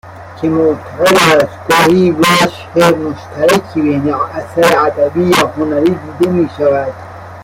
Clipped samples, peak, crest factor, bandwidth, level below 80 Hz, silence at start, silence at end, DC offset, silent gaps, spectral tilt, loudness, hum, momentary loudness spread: under 0.1%; 0 dBFS; 12 dB; 17 kHz; -46 dBFS; 0.05 s; 0 s; under 0.1%; none; -5 dB/octave; -12 LUFS; none; 9 LU